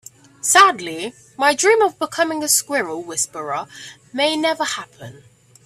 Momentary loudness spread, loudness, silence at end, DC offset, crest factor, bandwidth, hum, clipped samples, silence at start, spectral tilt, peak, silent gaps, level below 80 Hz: 17 LU; -18 LUFS; 0.5 s; under 0.1%; 20 dB; 15.5 kHz; none; under 0.1%; 0.45 s; -1 dB/octave; 0 dBFS; none; -68 dBFS